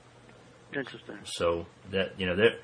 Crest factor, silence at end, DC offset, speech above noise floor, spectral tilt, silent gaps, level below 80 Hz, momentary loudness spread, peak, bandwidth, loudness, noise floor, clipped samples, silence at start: 22 dB; 0 s; under 0.1%; 24 dB; -4.5 dB/octave; none; -60 dBFS; 14 LU; -8 dBFS; 10.5 kHz; -31 LUFS; -54 dBFS; under 0.1%; 0.3 s